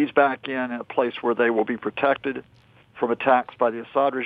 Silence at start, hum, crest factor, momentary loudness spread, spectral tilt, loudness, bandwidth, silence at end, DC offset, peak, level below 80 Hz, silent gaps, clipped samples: 0 s; none; 18 dB; 8 LU; -7.5 dB/octave; -23 LUFS; 4.9 kHz; 0 s; under 0.1%; -6 dBFS; -68 dBFS; none; under 0.1%